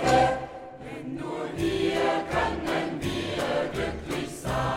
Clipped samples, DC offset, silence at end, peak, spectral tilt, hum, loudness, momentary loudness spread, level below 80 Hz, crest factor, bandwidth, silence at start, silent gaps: under 0.1%; under 0.1%; 0 s; -8 dBFS; -5 dB/octave; none; -28 LUFS; 11 LU; -44 dBFS; 18 dB; 16 kHz; 0 s; none